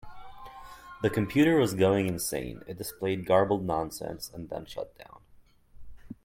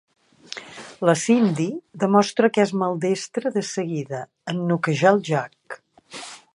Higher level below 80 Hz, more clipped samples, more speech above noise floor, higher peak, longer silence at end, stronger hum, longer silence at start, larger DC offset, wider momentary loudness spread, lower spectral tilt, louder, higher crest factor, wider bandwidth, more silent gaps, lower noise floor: first, -54 dBFS vs -72 dBFS; neither; first, 30 dB vs 21 dB; second, -10 dBFS vs -2 dBFS; about the same, 0.1 s vs 0.15 s; neither; second, 0.05 s vs 0.5 s; neither; first, 23 LU vs 19 LU; about the same, -5.5 dB/octave vs -5.5 dB/octave; second, -28 LUFS vs -22 LUFS; about the same, 20 dB vs 20 dB; first, 16.5 kHz vs 11.5 kHz; neither; first, -58 dBFS vs -42 dBFS